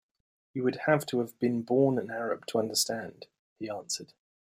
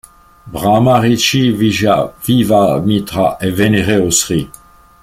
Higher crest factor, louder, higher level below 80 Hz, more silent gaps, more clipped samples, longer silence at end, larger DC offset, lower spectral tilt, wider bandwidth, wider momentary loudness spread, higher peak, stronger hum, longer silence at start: first, 20 dB vs 12 dB; second, -30 LUFS vs -13 LUFS; second, -74 dBFS vs -40 dBFS; first, 3.39-3.56 s vs none; neither; second, 0.4 s vs 0.55 s; neither; about the same, -4 dB/octave vs -4.5 dB/octave; about the same, 16 kHz vs 16.5 kHz; first, 13 LU vs 7 LU; second, -10 dBFS vs 0 dBFS; neither; about the same, 0.55 s vs 0.45 s